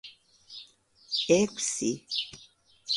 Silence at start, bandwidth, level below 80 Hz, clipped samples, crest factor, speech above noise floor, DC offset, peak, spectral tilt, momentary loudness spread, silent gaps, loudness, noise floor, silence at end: 0.05 s; 11.5 kHz; -68 dBFS; under 0.1%; 22 dB; 29 dB; under 0.1%; -10 dBFS; -3 dB/octave; 22 LU; none; -28 LUFS; -57 dBFS; 0 s